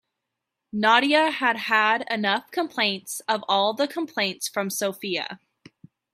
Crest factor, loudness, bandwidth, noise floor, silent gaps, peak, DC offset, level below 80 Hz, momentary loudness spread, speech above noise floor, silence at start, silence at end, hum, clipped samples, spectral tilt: 22 dB; -23 LUFS; 16 kHz; -83 dBFS; none; -4 dBFS; under 0.1%; -74 dBFS; 10 LU; 59 dB; 0.75 s; 0.75 s; none; under 0.1%; -2.5 dB/octave